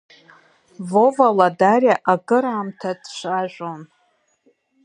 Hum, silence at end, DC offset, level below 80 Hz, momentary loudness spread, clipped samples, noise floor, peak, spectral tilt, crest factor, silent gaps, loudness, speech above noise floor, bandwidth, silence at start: none; 1 s; under 0.1%; -74 dBFS; 16 LU; under 0.1%; -64 dBFS; 0 dBFS; -6 dB/octave; 20 dB; none; -18 LUFS; 46 dB; 10 kHz; 0.8 s